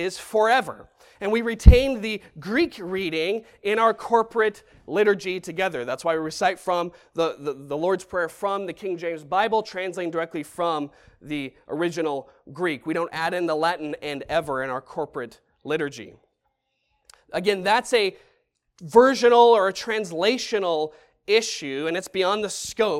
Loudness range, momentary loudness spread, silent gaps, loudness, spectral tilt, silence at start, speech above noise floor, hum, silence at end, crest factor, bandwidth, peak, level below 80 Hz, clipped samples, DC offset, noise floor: 8 LU; 15 LU; none; -23 LUFS; -5 dB/octave; 0 s; 51 dB; none; 0 s; 24 dB; 15 kHz; 0 dBFS; -32 dBFS; under 0.1%; under 0.1%; -74 dBFS